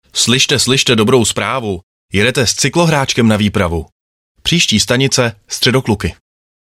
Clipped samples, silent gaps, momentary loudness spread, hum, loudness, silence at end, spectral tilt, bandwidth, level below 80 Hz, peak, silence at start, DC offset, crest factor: under 0.1%; 1.83-2.08 s, 3.92-4.35 s; 9 LU; none; -12 LUFS; 0.55 s; -3.5 dB/octave; 16 kHz; -40 dBFS; 0 dBFS; 0.15 s; under 0.1%; 14 dB